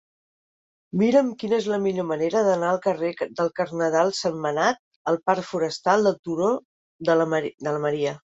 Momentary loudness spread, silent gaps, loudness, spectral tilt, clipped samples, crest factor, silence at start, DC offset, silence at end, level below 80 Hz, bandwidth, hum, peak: 7 LU; 4.79-5.05 s, 6.19-6.23 s, 6.65-6.99 s; -24 LUFS; -5.5 dB/octave; under 0.1%; 18 dB; 0.95 s; under 0.1%; 0.15 s; -68 dBFS; 8 kHz; none; -6 dBFS